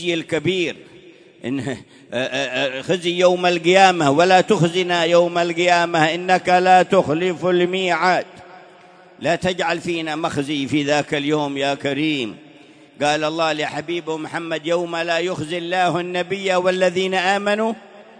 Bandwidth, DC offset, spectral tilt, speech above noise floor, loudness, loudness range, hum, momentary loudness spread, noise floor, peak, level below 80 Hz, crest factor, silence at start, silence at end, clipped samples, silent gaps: 10.5 kHz; under 0.1%; -4.5 dB/octave; 28 dB; -19 LUFS; 7 LU; none; 11 LU; -46 dBFS; -2 dBFS; -60 dBFS; 18 dB; 0 s; 0.15 s; under 0.1%; none